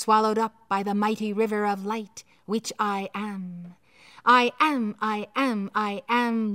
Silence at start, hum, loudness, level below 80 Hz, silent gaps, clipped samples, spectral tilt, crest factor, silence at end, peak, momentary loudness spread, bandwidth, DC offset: 0 s; none; -25 LUFS; -76 dBFS; none; under 0.1%; -4.5 dB/octave; 20 dB; 0 s; -6 dBFS; 13 LU; 16 kHz; under 0.1%